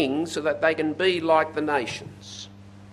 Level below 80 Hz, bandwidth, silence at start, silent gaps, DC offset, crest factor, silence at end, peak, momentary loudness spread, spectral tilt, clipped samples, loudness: -58 dBFS; 13 kHz; 0 s; none; under 0.1%; 18 dB; 0 s; -6 dBFS; 18 LU; -4.5 dB/octave; under 0.1%; -24 LUFS